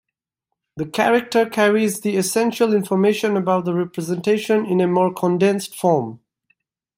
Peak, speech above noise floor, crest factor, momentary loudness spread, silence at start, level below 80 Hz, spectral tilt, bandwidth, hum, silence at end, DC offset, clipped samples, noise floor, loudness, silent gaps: -4 dBFS; 63 dB; 16 dB; 6 LU; 0.75 s; -66 dBFS; -5.5 dB/octave; 16 kHz; none; 0.8 s; under 0.1%; under 0.1%; -81 dBFS; -19 LUFS; none